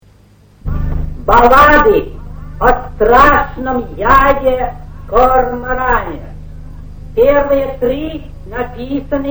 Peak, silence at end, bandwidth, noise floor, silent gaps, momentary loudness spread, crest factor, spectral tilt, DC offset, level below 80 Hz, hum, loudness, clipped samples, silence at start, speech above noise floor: 0 dBFS; 0 s; over 20 kHz; -45 dBFS; none; 19 LU; 12 dB; -6.5 dB/octave; under 0.1%; -22 dBFS; none; -12 LUFS; 0.4%; 0.65 s; 34 dB